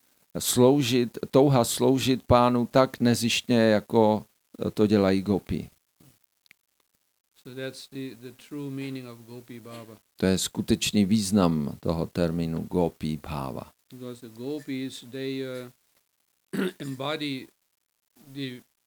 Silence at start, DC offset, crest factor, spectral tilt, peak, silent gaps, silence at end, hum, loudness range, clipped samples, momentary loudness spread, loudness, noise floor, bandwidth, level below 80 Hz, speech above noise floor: 0.35 s; under 0.1%; 22 dB; -5.5 dB/octave; -4 dBFS; 7.20-7.24 s; 0.25 s; none; 17 LU; under 0.1%; 20 LU; -25 LUFS; -72 dBFS; over 20 kHz; -54 dBFS; 47 dB